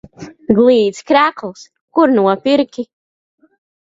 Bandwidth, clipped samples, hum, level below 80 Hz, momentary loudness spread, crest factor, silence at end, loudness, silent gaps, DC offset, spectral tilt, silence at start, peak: 7.8 kHz; under 0.1%; none; -54 dBFS; 18 LU; 16 dB; 0.95 s; -13 LUFS; 1.81-1.88 s; under 0.1%; -6 dB/octave; 0.2 s; 0 dBFS